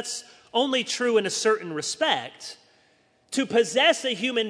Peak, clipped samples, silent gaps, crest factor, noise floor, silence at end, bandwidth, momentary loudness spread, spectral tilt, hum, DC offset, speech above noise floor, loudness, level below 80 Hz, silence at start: -6 dBFS; under 0.1%; none; 20 dB; -63 dBFS; 0 s; 11 kHz; 14 LU; -2 dB/octave; none; under 0.1%; 38 dB; -24 LUFS; -78 dBFS; 0 s